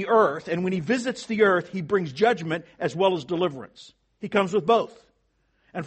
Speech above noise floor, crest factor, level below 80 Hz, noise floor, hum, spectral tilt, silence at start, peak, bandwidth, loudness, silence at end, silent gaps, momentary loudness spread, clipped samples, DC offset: 45 dB; 18 dB; -66 dBFS; -69 dBFS; none; -6 dB/octave; 0 s; -6 dBFS; 8.4 kHz; -24 LUFS; 0 s; none; 12 LU; under 0.1%; under 0.1%